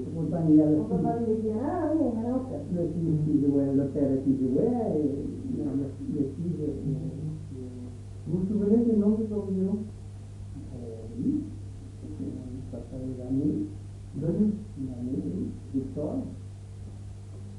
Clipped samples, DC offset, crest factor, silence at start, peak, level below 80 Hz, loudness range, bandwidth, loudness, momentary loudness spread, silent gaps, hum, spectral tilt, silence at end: under 0.1%; under 0.1%; 18 dB; 0 s; -10 dBFS; -50 dBFS; 7 LU; 11 kHz; -28 LUFS; 17 LU; none; 50 Hz at -45 dBFS; -10 dB/octave; 0 s